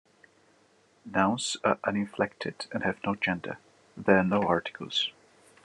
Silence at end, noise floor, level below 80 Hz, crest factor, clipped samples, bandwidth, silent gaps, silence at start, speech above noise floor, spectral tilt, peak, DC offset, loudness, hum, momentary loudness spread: 0.55 s; -64 dBFS; -74 dBFS; 24 dB; under 0.1%; 11 kHz; none; 1.05 s; 36 dB; -4.5 dB/octave; -6 dBFS; under 0.1%; -29 LUFS; none; 10 LU